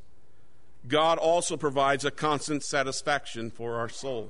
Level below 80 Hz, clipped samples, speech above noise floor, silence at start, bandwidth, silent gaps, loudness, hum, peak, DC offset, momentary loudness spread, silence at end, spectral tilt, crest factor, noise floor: -60 dBFS; under 0.1%; 35 dB; 0.85 s; 11 kHz; none; -28 LUFS; none; -10 dBFS; 1%; 10 LU; 0 s; -3.5 dB/octave; 18 dB; -63 dBFS